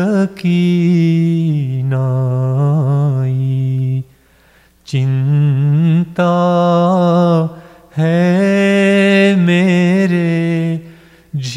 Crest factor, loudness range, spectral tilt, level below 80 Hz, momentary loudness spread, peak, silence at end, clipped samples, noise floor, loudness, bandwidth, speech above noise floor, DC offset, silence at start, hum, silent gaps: 12 dB; 4 LU; -8 dB/octave; -56 dBFS; 7 LU; 0 dBFS; 0 s; under 0.1%; -49 dBFS; -13 LUFS; 10 kHz; 37 dB; under 0.1%; 0 s; none; none